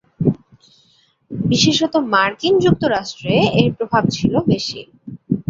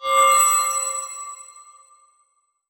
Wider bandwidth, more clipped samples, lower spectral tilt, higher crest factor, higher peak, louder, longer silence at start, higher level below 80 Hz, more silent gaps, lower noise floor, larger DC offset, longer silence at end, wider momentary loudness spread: second, 7.8 kHz vs over 20 kHz; neither; first, -5 dB/octave vs 3 dB/octave; about the same, 16 dB vs 18 dB; first, -2 dBFS vs -6 dBFS; about the same, -17 LUFS vs -17 LUFS; first, 0.2 s vs 0 s; first, -46 dBFS vs -74 dBFS; neither; second, -57 dBFS vs -67 dBFS; neither; second, 0.1 s vs 1.1 s; second, 15 LU vs 21 LU